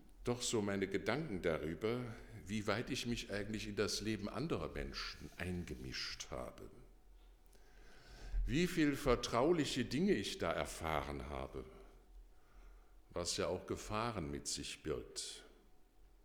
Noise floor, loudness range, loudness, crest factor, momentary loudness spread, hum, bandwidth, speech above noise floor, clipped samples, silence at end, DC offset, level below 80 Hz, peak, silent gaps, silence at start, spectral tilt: -64 dBFS; 8 LU; -40 LUFS; 20 dB; 13 LU; none; over 20 kHz; 24 dB; under 0.1%; 0.1 s; under 0.1%; -54 dBFS; -20 dBFS; none; 0 s; -4.5 dB/octave